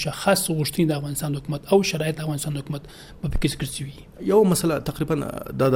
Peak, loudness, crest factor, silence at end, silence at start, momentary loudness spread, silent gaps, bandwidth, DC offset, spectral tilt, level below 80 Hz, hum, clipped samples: -6 dBFS; -24 LUFS; 18 dB; 0 s; 0 s; 13 LU; none; 17 kHz; under 0.1%; -5 dB/octave; -38 dBFS; none; under 0.1%